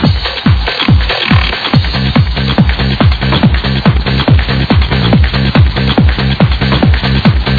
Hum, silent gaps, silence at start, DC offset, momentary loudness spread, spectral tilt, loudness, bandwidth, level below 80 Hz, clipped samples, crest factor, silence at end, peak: none; none; 0 s; under 0.1%; 2 LU; -8 dB/octave; -10 LUFS; 5 kHz; -16 dBFS; 0.4%; 10 dB; 0 s; 0 dBFS